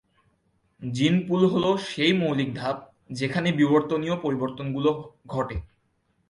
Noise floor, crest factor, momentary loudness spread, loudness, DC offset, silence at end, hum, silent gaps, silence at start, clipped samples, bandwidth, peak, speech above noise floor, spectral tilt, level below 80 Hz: -70 dBFS; 18 dB; 12 LU; -25 LUFS; under 0.1%; 0.65 s; none; none; 0.8 s; under 0.1%; 11 kHz; -8 dBFS; 46 dB; -6.5 dB/octave; -50 dBFS